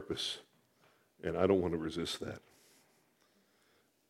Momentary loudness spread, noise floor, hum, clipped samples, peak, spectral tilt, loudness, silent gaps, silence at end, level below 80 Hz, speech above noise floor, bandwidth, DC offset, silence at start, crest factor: 15 LU; -72 dBFS; none; under 0.1%; -14 dBFS; -5 dB/octave; -36 LUFS; none; 1.7 s; -64 dBFS; 38 dB; 16 kHz; under 0.1%; 0 s; 24 dB